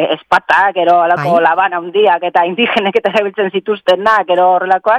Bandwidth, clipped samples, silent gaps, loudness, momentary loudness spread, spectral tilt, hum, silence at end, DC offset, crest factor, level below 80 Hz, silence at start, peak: 10.5 kHz; under 0.1%; none; -12 LUFS; 4 LU; -5.5 dB/octave; none; 0 s; under 0.1%; 12 dB; -56 dBFS; 0 s; 0 dBFS